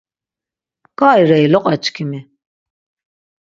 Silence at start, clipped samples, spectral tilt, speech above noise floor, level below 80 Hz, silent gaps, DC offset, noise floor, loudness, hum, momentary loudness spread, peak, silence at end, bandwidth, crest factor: 1 s; under 0.1%; -6.5 dB/octave; 76 dB; -62 dBFS; none; under 0.1%; -88 dBFS; -13 LUFS; none; 15 LU; 0 dBFS; 1.2 s; 7.6 kHz; 16 dB